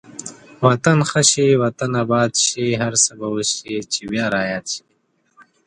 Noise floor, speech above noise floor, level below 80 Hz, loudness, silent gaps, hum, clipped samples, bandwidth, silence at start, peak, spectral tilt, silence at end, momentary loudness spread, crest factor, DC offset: -65 dBFS; 47 dB; -56 dBFS; -18 LUFS; none; none; under 0.1%; 11 kHz; 0.15 s; 0 dBFS; -3.5 dB/octave; 0.9 s; 12 LU; 20 dB; under 0.1%